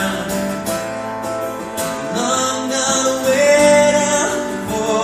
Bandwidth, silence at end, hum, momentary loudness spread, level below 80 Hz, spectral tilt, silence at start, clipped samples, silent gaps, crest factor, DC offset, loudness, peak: 15.5 kHz; 0 s; none; 12 LU; -48 dBFS; -3 dB/octave; 0 s; under 0.1%; none; 16 dB; under 0.1%; -17 LUFS; 0 dBFS